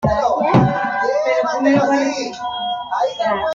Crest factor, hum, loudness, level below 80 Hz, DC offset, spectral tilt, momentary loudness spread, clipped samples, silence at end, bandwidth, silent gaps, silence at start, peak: 16 dB; none; -18 LUFS; -44 dBFS; under 0.1%; -6 dB/octave; 9 LU; under 0.1%; 0 s; 7.6 kHz; none; 0 s; -2 dBFS